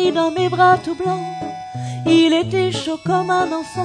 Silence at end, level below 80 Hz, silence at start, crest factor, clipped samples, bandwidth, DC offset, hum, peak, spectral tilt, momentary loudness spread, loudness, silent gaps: 0 s; -54 dBFS; 0 s; 14 dB; under 0.1%; 10 kHz; under 0.1%; none; -4 dBFS; -5.5 dB/octave; 14 LU; -18 LUFS; none